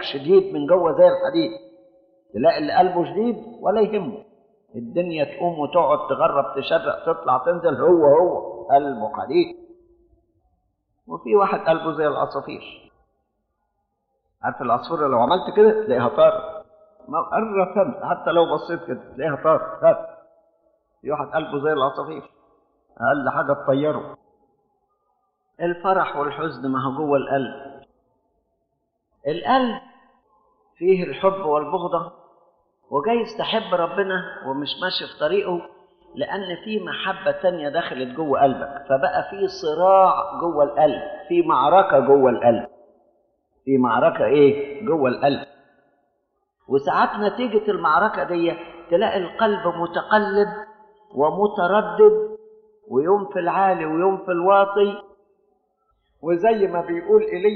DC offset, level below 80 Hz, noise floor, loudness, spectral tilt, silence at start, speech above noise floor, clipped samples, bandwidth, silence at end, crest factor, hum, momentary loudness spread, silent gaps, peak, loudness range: under 0.1%; -60 dBFS; -74 dBFS; -20 LUFS; -4 dB/octave; 0 s; 54 dB; under 0.1%; 6.2 kHz; 0 s; 18 dB; none; 13 LU; none; -2 dBFS; 7 LU